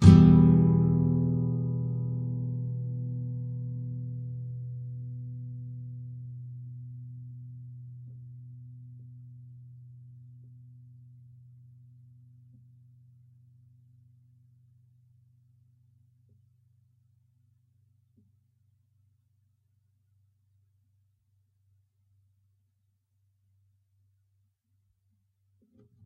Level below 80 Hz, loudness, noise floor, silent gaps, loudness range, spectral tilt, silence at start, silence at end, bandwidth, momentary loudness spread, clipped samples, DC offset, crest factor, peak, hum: -50 dBFS; -27 LUFS; -74 dBFS; none; 26 LU; -10 dB/octave; 0 s; 15.95 s; 4.2 kHz; 27 LU; under 0.1%; under 0.1%; 28 dB; -2 dBFS; none